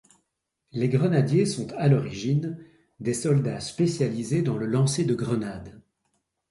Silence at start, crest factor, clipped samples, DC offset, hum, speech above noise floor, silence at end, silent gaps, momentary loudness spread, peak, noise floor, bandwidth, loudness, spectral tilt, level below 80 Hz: 0.75 s; 18 dB; under 0.1%; under 0.1%; none; 54 dB; 0.7 s; none; 11 LU; -8 dBFS; -78 dBFS; 11.5 kHz; -25 LUFS; -6.5 dB/octave; -58 dBFS